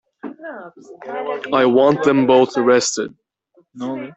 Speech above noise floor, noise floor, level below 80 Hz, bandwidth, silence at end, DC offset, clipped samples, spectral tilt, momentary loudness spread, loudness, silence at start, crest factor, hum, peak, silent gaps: 41 dB; -58 dBFS; -62 dBFS; 8.4 kHz; 0.05 s; under 0.1%; under 0.1%; -4.5 dB/octave; 20 LU; -16 LUFS; 0.25 s; 16 dB; none; -2 dBFS; none